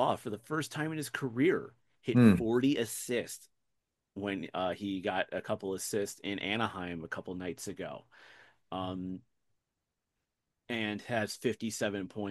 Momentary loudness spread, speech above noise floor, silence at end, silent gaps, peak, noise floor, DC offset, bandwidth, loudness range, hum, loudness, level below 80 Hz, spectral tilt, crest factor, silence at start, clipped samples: 13 LU; 54 dB; 0 s; none; -10 dBFS; -87 dBFS; under 0.1%; 12.5 kHz; 12 LU; none; -33 LUFS; -66 dBFS; -5.5 dB/octave; 24 dB; 0 s; under 0.1%